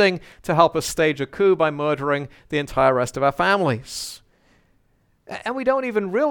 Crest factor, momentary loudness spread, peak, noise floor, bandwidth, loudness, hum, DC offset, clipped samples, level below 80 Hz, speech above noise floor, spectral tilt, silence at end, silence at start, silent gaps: 22 dB; 12 LU; 0 dBFS; -63 dBFS; 19 kHz; -21 LUFS; none; under 0.1%; under 0.1%; -50 dBFS; 42 dB; -5 dB/octave; 0 s; 0 s; none